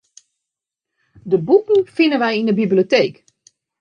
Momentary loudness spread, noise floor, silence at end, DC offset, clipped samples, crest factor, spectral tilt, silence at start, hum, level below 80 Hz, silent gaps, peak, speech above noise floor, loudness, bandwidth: 6 LU; -84 dBFS; 0.7 s; under 0.1%; under 0.1%; 16 dB; -6.5 dB/octave; 1.25 s; none; -66 dBFS; none; -2 dBFS; 68 dB; -16 LUFS; 7 kHz